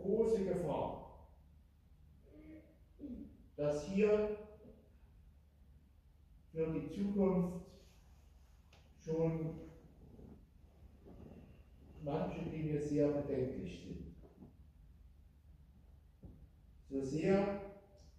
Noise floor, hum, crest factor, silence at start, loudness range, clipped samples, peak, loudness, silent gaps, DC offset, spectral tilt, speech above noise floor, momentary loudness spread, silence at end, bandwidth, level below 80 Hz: -65 dBFS; none; 20 dB; 0 s; 7 LU; under 0.1%; -22 dBFS; -38 LUFS; none; under 0.1%; -8 dB/octave; 28 dB; 25 LU; 0.1 s; 12 kHz; -60 dBFS